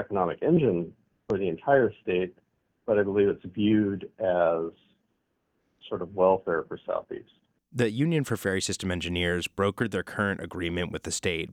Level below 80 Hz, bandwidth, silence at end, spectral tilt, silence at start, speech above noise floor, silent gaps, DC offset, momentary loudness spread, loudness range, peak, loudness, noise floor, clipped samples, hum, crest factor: -56 dBFS; 16 kHz; 0 s; -5.5 dB/octave; 0 s; 49 dB; none; under 0.1%; 10 LU; 3 LU; -8 dBFS; -27 LUFS; -75 dBFS; under 0.1%; none; 20 dB